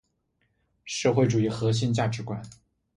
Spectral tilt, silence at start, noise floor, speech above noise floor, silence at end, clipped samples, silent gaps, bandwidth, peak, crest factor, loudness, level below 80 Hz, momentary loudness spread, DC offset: -6 dB/octave; 0.85 s; -73 dBFS; 48 dB; 0.5 s; under 0.1%; none; 11 kHz; -8 dBFS; 20 dB; -26 LUFS; -58 dBFS; 12 LU; under 0.1%